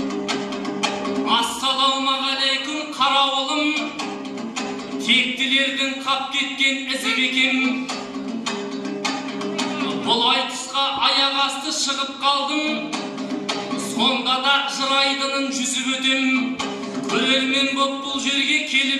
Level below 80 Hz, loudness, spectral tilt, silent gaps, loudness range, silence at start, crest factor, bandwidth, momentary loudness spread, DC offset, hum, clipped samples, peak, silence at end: -66 dBFS; -20 LUFS; -1.5 dB/octave; none; 2 LU; 0 s; 18 dB; 13.5 kHz; 10 LU; under 0.1%; none; under 0.1%; -4 dBFS; 0 s